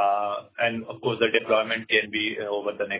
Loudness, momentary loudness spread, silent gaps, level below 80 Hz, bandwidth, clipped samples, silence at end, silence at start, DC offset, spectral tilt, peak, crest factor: -25 LUFS; 7 LU; none; -66 dBFS; 4 kHz; under 0.1%; 0 s; 0 s; under 0.1%; -7.5 dB/octave; -6 dBFS; 18 dB